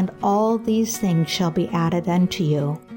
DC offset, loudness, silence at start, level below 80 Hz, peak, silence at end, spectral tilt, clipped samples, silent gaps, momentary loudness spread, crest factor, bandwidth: under 0.1%; -21 LUFS; 0 s; -54 dBFS; -10 dBFS; 0 s; -6 dB/octave; under 0.1%; none; 2 LU; 10 dB; 17 kHz